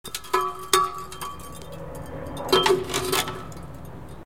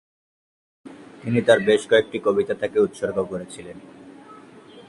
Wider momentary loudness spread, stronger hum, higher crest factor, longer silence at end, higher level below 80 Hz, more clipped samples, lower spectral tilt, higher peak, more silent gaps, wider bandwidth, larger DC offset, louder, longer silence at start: about the same, 19 LU vs 21 LU; neither; about the same, 26 dB vs 22 dB; about the same, 0 s vs 0.1 s; first, -48 dBFS vs -60 dBFS; neither; second, -3 dB/octave vs -5.5 dB/octave; about the same, 0 dBFS vs -2 dBFS; neither; first, 17 kHz vs 11.5 kHz; first, 0.7% vs under 0.1%; second, -24 LUFS vs -21 LUFS; second, 0.05 s vs 0.85 s